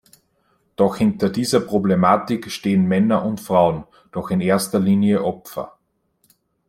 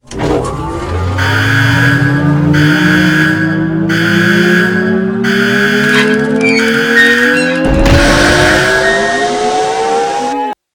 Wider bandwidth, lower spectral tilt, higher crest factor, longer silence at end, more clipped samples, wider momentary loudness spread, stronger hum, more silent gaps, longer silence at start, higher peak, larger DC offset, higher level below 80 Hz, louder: second, 15.5 kHz vs 18 kHz; first, -6.5 dB/octave vs -5 dB/octave; first, 18 dB vs 10 dB; first, 1 s vs 0.2 s; second, under 0.1% vs 0.2%; first, 14 LU vs 7 LU; neither; neither; first, 0.8 s vs 0.1 s; about the same, -2 dBFS vs 0 dBFS; neither; second, -54 dBFS vs -26 dBFS; second, -19 LUFS vs -10 LUFS